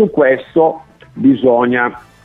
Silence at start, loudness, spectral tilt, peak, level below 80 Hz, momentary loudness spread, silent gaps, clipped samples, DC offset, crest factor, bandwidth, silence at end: 0 s; -13 LUFS; -9 dB/octave; 0 dBFS; -52 dBFS; 6 LU; none; under 0.1%; under 0.1%; 12 dB; 4.1 kHz; 0.25 s